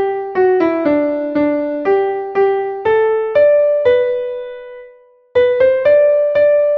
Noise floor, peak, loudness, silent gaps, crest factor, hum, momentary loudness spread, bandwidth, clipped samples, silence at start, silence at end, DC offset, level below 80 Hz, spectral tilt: -45 dBFS; -2 dBFS; -14 LUFS; none; 12 dB; none; 8 LU; 5 kHz; under 0.1%; 0 s; 0 s; under 0.1%; -54 dBFS; -7.5 dB/octave